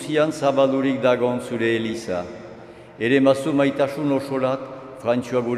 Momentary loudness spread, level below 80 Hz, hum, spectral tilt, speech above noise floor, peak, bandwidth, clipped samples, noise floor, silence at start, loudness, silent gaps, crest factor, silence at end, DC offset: 11 LU; -62 dBFS; none; -6 dB/octave; 21 dB; -2 dBFS; 13 kHz; under 0.1%; -41 dBFS; 0 s; -21 LUFS; none; 18 dB; 0 s; under 0.1%